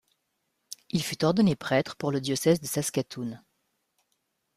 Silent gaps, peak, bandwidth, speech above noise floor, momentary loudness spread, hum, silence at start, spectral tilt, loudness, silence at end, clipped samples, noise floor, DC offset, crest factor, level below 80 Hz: none; -10 dBFS; 15.5 kHz; 51 dB; 15 LU; none; 0.7 s; -5 dB/octave; -27 LUFS; 1.2 s; under 0.1%; -78 dBFS; under 0.1%; 18 dB; -64 dBFS